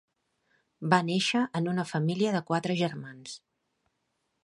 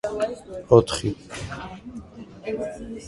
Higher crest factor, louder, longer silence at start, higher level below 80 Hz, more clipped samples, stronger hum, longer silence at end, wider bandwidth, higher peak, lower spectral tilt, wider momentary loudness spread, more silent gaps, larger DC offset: about the same, 24 dB vs 24 dB; second, -28 LUFS vs -24 LUFS; first, 0.8 s vs 0.05 s; second, -74 dBFS vs -46 dBFS; neither; neither; first, 1.1 s vs 0 s; about the same, 11.5 kHz vs 11.5 kHz; second, -6 dBFS vs 0 dBFS; about the same, -5.5 dB/octave vs -6 dB/octave; second, 17 LU vs 22 LU; neither; neither